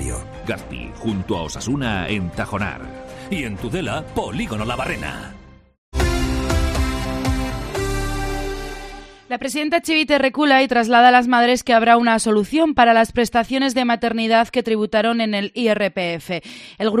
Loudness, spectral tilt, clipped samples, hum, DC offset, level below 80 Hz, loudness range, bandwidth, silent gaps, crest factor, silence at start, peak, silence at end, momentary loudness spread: -19 LUFS; -5 dB/octave; under 0.1%; none; under 0.1%; -32 dBFS; 10 LU; 14 kHz; 5.78-5.92 s; 18 dB; 0 s; 0 dBFS; 0 s; 15 LU